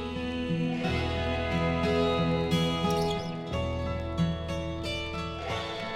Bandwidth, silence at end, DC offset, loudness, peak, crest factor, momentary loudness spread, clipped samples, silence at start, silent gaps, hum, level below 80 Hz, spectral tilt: 13.5 kHz; 0 s; under 0.1%; -30 LUFS; -16 dBFS; 14 dB; 7 LU; under 0.1%; 0 s; none; none; -42 dBFS; -6 dB/octave